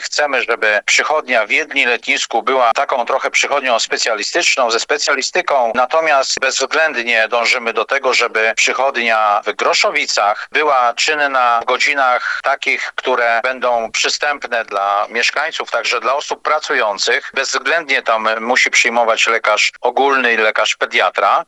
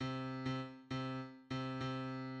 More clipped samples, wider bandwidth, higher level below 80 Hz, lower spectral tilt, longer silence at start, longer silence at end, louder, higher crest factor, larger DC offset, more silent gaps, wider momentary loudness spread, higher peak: neither; first, 12 kHz vs 8.4 kHz; first, -64 dBFS vs -70 dBFS; second, 0.5 dB/octave vs -6.5 dB/octave; about the same, 0 s vs 0 s; about the same, 0.05 s vs 0 s; first, -14 LUFS vs -43 LUFS; about the same, 16 dB vs 14 dB; neither; neither; about the same, 4 LU vs 4 LU; first, 0 dBFS vs -28 dBFS